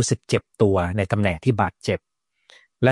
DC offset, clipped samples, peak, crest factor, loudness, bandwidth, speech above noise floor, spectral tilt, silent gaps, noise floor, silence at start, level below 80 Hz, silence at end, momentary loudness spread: under 0.1%; under 0.1%; -4 dBFS; 20 dB; -22 LUFS; 11.5 kHz; 34 dB; -5.5 dB/octave; none; -56 dBFS; 0 s; -52 dBFS; 0 s; 7 LU